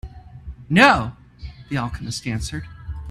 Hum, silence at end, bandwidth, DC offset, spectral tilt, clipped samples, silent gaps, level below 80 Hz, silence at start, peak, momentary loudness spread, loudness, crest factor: none; 0 s; 13.5 kHz; under 0.1%; -5 dB/octave; under 0.1%; none; -38 dBFS; 0.05 s; 0 dBFS; 26 LU; -19 LUFS; 22 dB